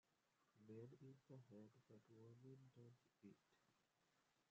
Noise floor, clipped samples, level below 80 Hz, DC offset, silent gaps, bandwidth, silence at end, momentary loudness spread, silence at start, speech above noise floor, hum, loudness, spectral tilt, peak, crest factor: -86 dBFS; under 0.1%; under -90 dBFS; under 0.1%; none; 7.4 kHz; 0 s; 6 LU; 0.05 s; 19 dB; none; -66 LUFS; -8 dB/octave; -50 dBFS; 18 dB